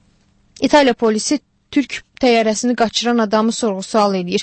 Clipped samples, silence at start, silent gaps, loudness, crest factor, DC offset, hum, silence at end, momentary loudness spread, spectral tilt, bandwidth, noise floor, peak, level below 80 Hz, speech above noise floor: under 0.1%; 0.6 s; none; -16 LUFS; 16 dB; under 0.1%; none; 0 s; 8 LU; -4 dB/octave; 8.8 kHz; -56 dBFS; 0 dBFS; -52 dBFS; 40 dB